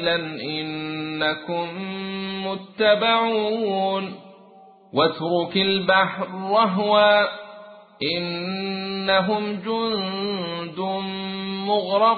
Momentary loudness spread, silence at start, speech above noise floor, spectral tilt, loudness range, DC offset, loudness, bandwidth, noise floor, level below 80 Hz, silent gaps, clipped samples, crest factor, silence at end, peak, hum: 11 LU; 0 s; 27 dB; -9.5 dB/octave; 4 LU; under 0.1%; -22 LUFS; 4.8 kHz; -49 dBFS; -62 dBFS; none; under 0.1%; 18 dB; 0 s; -4 dBFS; none